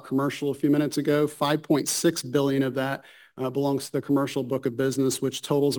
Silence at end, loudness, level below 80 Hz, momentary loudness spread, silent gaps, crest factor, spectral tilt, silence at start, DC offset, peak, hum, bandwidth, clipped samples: 0 s; -25 LUFS; -68 dBFS; 5 LU; none; 14 dB; -5 dB/octave; 0.05 s; under 0.1%; -10 dBFS; none; 19 kHz; under 0.1%